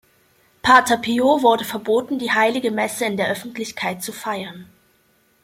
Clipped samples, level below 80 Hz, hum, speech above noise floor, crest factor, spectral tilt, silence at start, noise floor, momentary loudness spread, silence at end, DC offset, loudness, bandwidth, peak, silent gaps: under 0.1%; -60 dBFS; none; 41 dB; 20 dB; -3.5 dB/octave; 0.65 s; -60 dBFS; 13 LU; 0.8 s; under 0.1%; -19 LUFS; 16.5 kHz; -2 dBFS; none